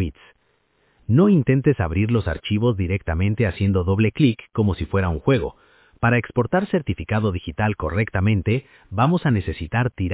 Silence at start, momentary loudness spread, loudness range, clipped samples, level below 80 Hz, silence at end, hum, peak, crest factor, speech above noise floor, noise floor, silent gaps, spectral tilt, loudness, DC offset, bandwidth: 0 s; 6 LU; 2 LU; under 0.1%; -34 dBFS; 0 s; none; -4 dBFS; 16 dB; 45 dB; -65 dBFS; none; -11.5 dB/octave; -21 LUFS; under 0.1%; 4 kHz